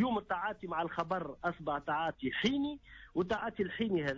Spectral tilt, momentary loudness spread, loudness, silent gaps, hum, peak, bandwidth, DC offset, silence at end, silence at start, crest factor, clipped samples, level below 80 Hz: -6 dB/octave; 5 LU; -36 LUFS; none; none; -22 dBFS; 7.6 kHz; under 0.1%; 0 s; 0 s; 14 dB; under 0.1%; -62 dBFS